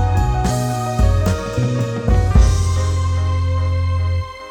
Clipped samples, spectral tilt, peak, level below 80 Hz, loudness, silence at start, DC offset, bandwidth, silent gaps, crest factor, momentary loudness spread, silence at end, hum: under 0.1%; -6.5 dB/octave; 0 dBFS; -22 dBFS; -18 LUFS; 0 s; under 0.1%; 17 kHz; none; 16 dB; 6 LU; 0 s; none